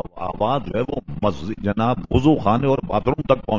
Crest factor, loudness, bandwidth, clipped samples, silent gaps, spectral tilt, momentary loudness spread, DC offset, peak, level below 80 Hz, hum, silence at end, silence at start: 18 dB; -21 LUFS; 7.6 kHz; under 0.1%; none; -8.5 dB/octave; 7 LU; 1%; -2 dBFS; -38 dBFS; none; 0 s; 0 s